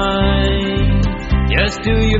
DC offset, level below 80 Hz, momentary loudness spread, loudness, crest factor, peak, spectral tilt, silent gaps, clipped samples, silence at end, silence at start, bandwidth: under 0.1%; -18 dBFS; 3 LU; -16 LUFS; 14 dB; 0 dBFS; -5 dB/octave; none; under 0.1%; 0 s; 0 s; 7.8 kHz